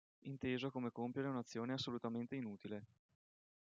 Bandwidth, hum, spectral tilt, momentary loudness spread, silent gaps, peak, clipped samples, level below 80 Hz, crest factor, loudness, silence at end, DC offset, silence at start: 7.6 kHz; none; -6 dB/octave; 9 LU; none; -28 dBFS; under 0.1%; -84 dBFS; 16 dB; -45 LUFS; 0.9 s; under 0.1%; 0.25 s